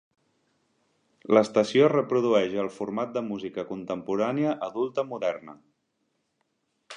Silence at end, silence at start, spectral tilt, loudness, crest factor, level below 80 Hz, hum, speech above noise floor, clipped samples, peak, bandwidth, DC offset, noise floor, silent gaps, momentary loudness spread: 0 s; 1.3 s; -6 dB/octave; -26 LUFS; 22 dB; -72 dBFS; none; 50 dB; under 0.1%; -6 dBFS; 10.5 kHz; under 0.1%; -76 dBFS; none; 12 LU